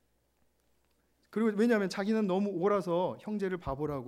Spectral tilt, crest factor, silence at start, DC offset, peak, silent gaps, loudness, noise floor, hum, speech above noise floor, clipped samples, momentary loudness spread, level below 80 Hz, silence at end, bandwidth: -7 dB/octave; 16 dB; 1.3 s; under 0.1%; -16 dBFS; none; -31 LUFS; -73 dBFS; none; 42 dB; under 0.1%; 7 LU; -60 dBFS; 0 s; 13 kHz